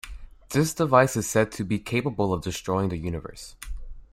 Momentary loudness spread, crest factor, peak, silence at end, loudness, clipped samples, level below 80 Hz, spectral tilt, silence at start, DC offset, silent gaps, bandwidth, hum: 21 LU; 22 dB; -4 dBFS; 0.1 s; -25 LUFS; under 0.1%; -42 dBFS; -5.5 dB/octave; 0.05 s; under 0.1%; none; 16 kHz; none